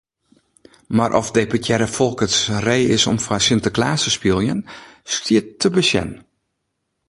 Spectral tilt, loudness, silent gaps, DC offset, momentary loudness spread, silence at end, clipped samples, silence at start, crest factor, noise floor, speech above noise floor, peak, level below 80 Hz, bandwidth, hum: -4 dB/octave; -18 LUFS; none; under 0.1%; 7 LU; 0.9 s; under 0.1%; 0.9 s; 20 dB; -74 dBFS; 56 dB; 0 dBFS; -46 dBFS; 11.5 kHz; none